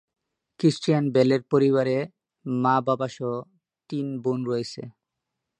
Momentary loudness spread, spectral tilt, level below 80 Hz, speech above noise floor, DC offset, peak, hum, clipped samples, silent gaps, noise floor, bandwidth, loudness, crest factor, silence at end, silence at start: 14 LU; -7 dB/octave; -70 dBFS; 60 dB; under 0.1%; -8 dBFS; none; under 0.1%; none; -83 dBFS; 10 kHz; -24 LUFS; 18 dB; 0.7 s; 0.6 s